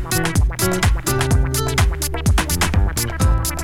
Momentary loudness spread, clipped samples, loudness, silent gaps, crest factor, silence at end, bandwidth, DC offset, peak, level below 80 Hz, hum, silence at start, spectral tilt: 2 LU; under 0.1%; -18 LUFS; none; 14 dB; 0 s; 18 kHz; under 0.1%; -4 dBFS; -22 dBFS; none; 0 s; -4.5 dB/octave